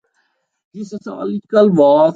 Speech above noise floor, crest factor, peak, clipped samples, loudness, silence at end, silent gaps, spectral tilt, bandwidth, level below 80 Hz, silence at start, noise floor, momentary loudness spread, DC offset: 52 dB; 14 dB; -2 dBFS; under 0.1%; -14 LUFS; 0 s; none; -8 dB/octave; 7.6 kHz; -64 dBFS; 0.75 s; -66 dBFS; 19 LU; under 0.1%